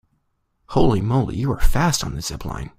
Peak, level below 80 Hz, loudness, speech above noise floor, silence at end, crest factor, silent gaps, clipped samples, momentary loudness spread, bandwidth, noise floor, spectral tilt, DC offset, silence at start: -2 dBFS; -26 dBFS; -21 LUFS; 51 dB; 0.1 s; 18 dB; none; under 0.1%; 10 LU; 16 kHz; -69 dBFS; -5.5 dB/octave; under 0.1%; 0.7 s